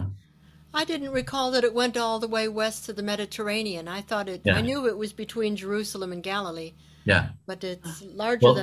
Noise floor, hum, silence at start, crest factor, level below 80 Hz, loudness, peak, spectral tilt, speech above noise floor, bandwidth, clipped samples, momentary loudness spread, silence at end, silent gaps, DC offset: -55 dBFS; none; 0 s; 22 dB; -50 dBFS; -27 LUFS; -4 dBFS; -5 dB/octave; 28 dB; 15 kHz; under 0.1%; 12 LU; 0 s; none; under 0.1%